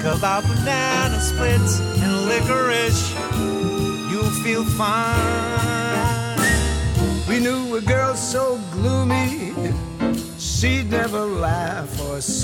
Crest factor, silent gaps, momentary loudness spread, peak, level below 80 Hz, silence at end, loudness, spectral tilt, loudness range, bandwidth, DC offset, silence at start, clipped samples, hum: 14 dB; none; 5 LU; -6 dBFS; -32 dBFS; 0 s; -20 LUFS; -4.5 dB/octave; 2 LU; 17.5 kHz; under 0.1%; 0 s; under 0.1%; none